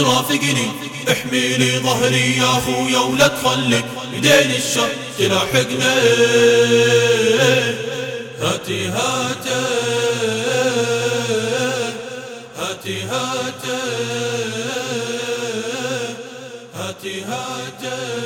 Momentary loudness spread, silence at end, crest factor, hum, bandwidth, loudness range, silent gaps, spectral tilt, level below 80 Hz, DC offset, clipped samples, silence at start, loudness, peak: 13 LU; 0 s; 18 dB; none; 17.5 kHz; 9 LU; none; -3.5 dB/octave; -56 dBFS; under 0.1%; under 0.1%; 0 s; -17 LUFS; 0 dBFS